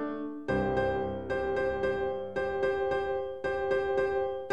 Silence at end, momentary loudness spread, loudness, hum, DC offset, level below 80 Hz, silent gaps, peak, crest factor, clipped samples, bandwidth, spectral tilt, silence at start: 0 s; 4 LU; -31 LUFS; none; 0.3%; -50 dBFS; none; -16 dBFS; 14 dB; under 0.1%; 9.2 kHz; -7 dB/octave; 0 s